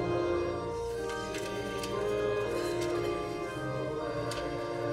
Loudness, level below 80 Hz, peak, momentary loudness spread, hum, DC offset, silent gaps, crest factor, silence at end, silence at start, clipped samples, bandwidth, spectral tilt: -34 LUFS; -52 dBFS; -20 dBFS; 5 LU; none; under 0.1%; none; 14 dB; 0 s; 0 s; under 0.1%; 16 kHz; -5.5 dB/octave